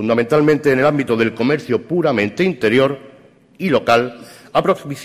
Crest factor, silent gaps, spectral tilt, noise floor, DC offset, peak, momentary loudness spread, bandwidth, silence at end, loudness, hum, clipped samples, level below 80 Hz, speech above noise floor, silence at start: 14 dB; none; -6.5 dB/octave; -46 dBFS; under 0.1%; -2 dBFS; 5 LU; 15 kHz; 0 s; -16 LUFS; none; under 0.1%; -54 dBFS; 30 dB; 0 s